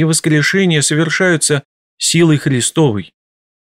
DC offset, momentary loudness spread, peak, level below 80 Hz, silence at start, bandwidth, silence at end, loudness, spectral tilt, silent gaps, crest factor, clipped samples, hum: 0.1%; 4 LU; -2 dBFS; -56 dBFS; 0 s; 15.5 kHz; 0.6 s; -13 LUFS; -4 dB/octave; 1.65-1.97 s; 12 dB; under 0.1%; none